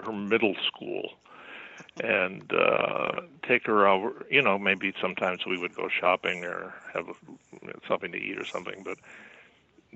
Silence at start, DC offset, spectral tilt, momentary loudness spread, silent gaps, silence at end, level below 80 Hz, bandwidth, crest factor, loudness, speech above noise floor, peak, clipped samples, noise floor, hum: 0 s; under 0.1%; -5.5 dB/octave; 20 LU; none; 0.7 s; -74 dBFS; 8.2 kHz; 22 dB; -27 LUFS; 32 dB; -6 dBFS; under 0.1%; -61 dBFS; none